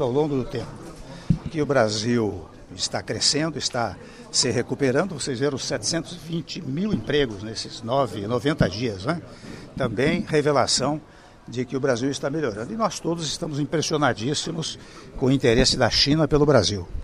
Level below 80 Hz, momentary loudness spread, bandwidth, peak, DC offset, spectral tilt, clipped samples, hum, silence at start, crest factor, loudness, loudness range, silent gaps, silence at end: -42 dBFS; 13 LU; 14 kHz; -4 dBFS; under 0.1%; -4.5 dB/octave; under 0.1%; none; 0 s; 20 dB; -23 LUFS; 4 LU; none; 0 s